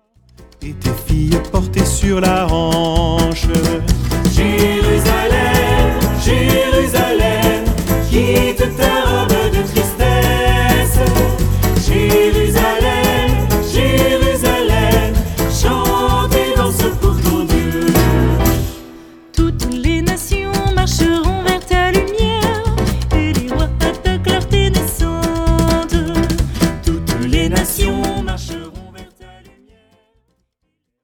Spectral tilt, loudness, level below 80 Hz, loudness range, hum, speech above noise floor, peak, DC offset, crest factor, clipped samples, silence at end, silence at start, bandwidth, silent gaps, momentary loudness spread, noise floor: -5 dB/octave; -15 LUFS; -20 dBFS; 3 LU; none; 56 dB; 0 dBFS; under 0.1%; 14 dB; under 0.1%; 2 s; 0.4 s; over 20 kHz; none; 5 LU; -71 dBFS